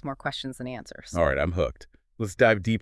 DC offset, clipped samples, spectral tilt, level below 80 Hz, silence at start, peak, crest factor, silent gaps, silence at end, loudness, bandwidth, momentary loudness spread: under 0.1%; under 0.1%; -6 dB/octave; -44 dBFS; 0.05 s; -6 dBFS; 20 dB; none; 0 s; -26 LUFS; 12 kHz; 15 LU